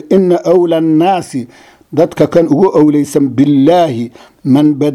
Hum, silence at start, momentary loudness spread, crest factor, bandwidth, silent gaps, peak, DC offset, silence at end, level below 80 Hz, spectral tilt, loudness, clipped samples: none; 0.05 s; 14 LU; 10 dB; 13 kHz; none; 0 dBFS; under 0.1%; 0 s; -50 dBFS; -7.5 dB/octave; -10 LUFS; 0.3%